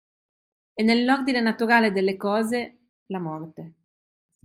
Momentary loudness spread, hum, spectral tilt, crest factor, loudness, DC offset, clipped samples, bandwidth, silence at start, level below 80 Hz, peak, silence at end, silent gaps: 18 LU; none; -5.5 dB/octave; 20 dB; -23 LUFS; under 0.1%; under 0.1%; 14.5 kHz; 0.75 s; -68 dBFS; -6 dBFS; 0.75 s; 2.89-3.06 s